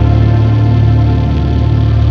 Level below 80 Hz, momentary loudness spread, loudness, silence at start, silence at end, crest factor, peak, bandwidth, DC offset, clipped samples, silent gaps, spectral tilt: -16 dBFS; 3 LU; -11 LUFS; 0 s; 0 s; 8 dB; 0 dBFS; 5.2 kHz; under 0.1%; under 0.1%; none; -9.5 dB/octave